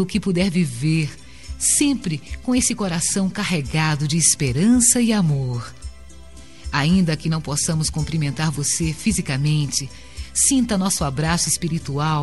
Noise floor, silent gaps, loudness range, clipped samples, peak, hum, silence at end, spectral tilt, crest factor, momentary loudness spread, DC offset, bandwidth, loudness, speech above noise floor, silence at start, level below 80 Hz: -42 dBFS; none; 4 LU; under 0.1%; -2 dBFS; none; 0 s; -4 dB/octave; 18 dB; 11 LU; 0.8%; 12 kHz; -19 LUFS; 23 dB; 0 s; -40 dBFS